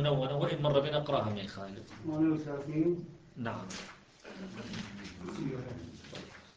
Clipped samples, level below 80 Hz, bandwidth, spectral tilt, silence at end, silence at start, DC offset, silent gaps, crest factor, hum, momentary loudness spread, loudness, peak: under 0.1%; -62 dBFS; 9 kHz; -6.5 dB/octave; 0.05 s; 0 s; under 0.1%; none; 20 dB; none; 17 LU; -35 LUFS; -14 dBFS